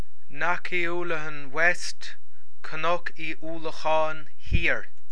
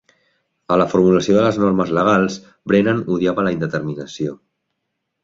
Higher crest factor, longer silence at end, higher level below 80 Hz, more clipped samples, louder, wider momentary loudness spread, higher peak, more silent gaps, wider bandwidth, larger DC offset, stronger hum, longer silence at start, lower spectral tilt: first, 22 dB vs 16 dB; second, 0.25 s vs 0.9 s; first, -40 dBFS vs -52 dBFS; neither; second, -28 LUFS vs -17 LUFS; first, 15 LU vs 12 LU; second, -6 dBFS vs -2 dBFS; neither; first, 11 kHz vs 7.6 kHz; first, 10% vs under 0.1%; neither; second, 0.3 s vs 0.7 s; second, -4.5 dB/octave vs -6.5 dB/octave